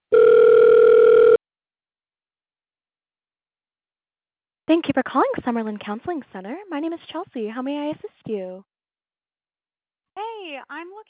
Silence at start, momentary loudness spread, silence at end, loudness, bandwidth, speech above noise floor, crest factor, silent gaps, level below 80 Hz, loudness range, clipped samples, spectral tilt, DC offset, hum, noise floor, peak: 0.1 s; 22 LU; 0.1 s; -17 LUFS; 4 kHz; over 64 dB; 14 dB; none; -62 dBFS; 15 LU; under 0.1%; -9.5 dB/octave; under 0.1%; none; under -90 dBFS; -6 dBFS